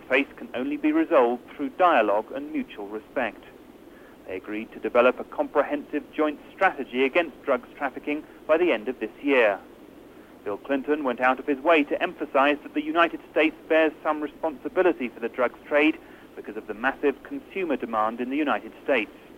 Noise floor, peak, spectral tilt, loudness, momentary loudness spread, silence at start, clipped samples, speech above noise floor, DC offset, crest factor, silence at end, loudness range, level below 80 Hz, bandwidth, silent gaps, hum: -48 dBFS; -6 dBFS; -5.5 dB/octave; -25 LUFS; 13 LU; 0 s; under 0.1%; 23 dB; under 0.1%; 18 dB; 0.2 s; 4 LU; -62 dBFS; 16 kHz; none; none